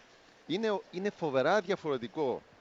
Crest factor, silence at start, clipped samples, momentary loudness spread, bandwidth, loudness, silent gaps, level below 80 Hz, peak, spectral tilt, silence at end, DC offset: 18 dB; 0.5 s; under 0.1%; 7 LU; 7.8 kHz; -33 LUFS; none; -74 dBFS; -16 dBFS; -5.5 dB/octave; 0.2 s; under 0.1%